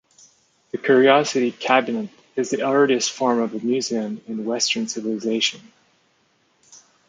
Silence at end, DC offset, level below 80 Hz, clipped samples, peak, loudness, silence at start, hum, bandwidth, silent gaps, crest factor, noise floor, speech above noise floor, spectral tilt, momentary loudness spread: 0.3 s; under 0.1%; -74 dBFS; under 0.1%; -2 dBFS; -21 LUFS; 0.75 s; none; 9.4 kHz; none; 20 dB; -63 dBFS; 43 dB; -3 dB/octave; 12 LU